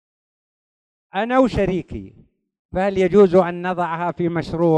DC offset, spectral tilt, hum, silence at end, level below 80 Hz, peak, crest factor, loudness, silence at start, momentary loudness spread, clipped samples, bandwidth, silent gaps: under 0.1%; -8 dB/octave; none; 0 s; -42 dBFS; -2 dBFS; 18 dB; -19 LUFS; 1.15 s; 15 LU; under 0.1%; 9 kHz; 2.59-2.69 s